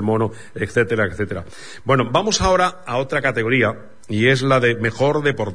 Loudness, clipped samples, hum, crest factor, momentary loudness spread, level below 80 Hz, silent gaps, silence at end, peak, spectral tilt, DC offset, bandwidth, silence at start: -19 LUFS; under 0.1%; none; 18 dB; 11 LU; -40 dBFS; none; 0 s; -2 dBFS; -5 dB/octave; 1%; 10.5 kHz; 0 s